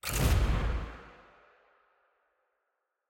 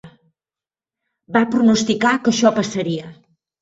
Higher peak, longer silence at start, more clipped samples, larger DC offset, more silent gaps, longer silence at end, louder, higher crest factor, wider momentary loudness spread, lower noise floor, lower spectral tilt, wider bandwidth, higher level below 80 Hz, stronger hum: second, -16 dBFS vs -2 dBFS; about the same, 0.05 s vs 0.05 s; neither; neither; neither; first, 2 s vs 0.5 s; second, -31 LUFS vs -17 LUFS; about the same, 18 dB vs 18 dB; first, 22 LU vs 9 LU; second, -83 dBFS vs under -90 dBFS; about the same, -5 dB/octave vs -4.5 dB/octave; first, 17 kHz vs 8 kHz; first, -36 dBFS vs -60 dBFS; neither